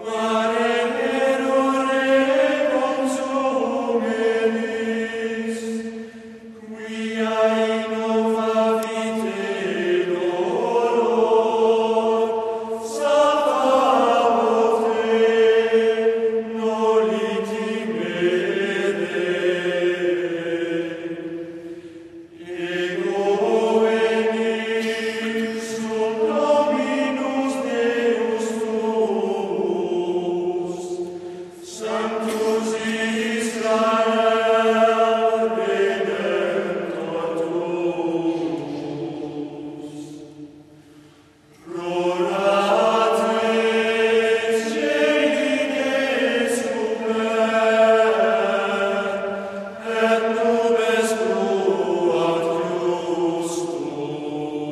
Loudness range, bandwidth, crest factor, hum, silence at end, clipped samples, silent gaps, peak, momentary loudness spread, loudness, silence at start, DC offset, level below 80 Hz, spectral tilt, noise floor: 6 LU; 13 kHz; 16 dB; none; 0 s; under 0.1%; none; -6 dBFS; 11 LU; -21 LUFS; 0 s; under 0.1%; -68 dBFS; -4.5 dB/octave; -51 dBFS